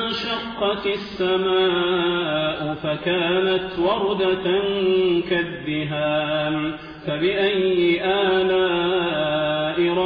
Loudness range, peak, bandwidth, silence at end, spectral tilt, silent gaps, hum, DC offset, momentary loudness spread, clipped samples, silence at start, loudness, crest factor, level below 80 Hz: 1 LU; -10 dBFS; 5.4 kHz; 0 s; -7.5 dB/octave; none; none; under 0.1%; 6 LU; under 0.1%; 0 s; -21 LUFS; 12 dB; -52 dBFS